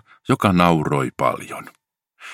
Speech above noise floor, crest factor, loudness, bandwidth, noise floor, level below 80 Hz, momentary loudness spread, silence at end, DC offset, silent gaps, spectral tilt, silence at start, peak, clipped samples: 29 dB; 20 dB; -19 LUFS; 16 kHz; -48 dBFS; -50 dBFS; 17 LU; 0 s; under 0.1%; none; -6.5 dB/octave; 0.3 s; 0 dBFS; under 0.1%